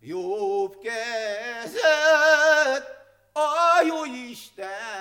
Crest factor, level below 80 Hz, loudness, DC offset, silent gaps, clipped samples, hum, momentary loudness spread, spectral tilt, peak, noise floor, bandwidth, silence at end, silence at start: 18 dB; -72 dBFS; -22 LUFS; under 0.1%; none; under 0.1%; none; 17 LU; -1.5 dB/octave; -6 dBFS; -46 dBFS; 16.5 kHz; 0 s; 0.05 s